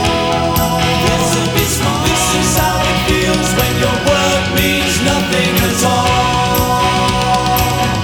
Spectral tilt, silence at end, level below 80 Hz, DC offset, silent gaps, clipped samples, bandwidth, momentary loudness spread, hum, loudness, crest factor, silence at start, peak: -4 dB/octave; 0 s; -26 dBFS; under 0.1%; none; under 0.1%; 19 kHz; 1 LU; none; -13 LUFS; 12 dB; 0 s; 0 dBFS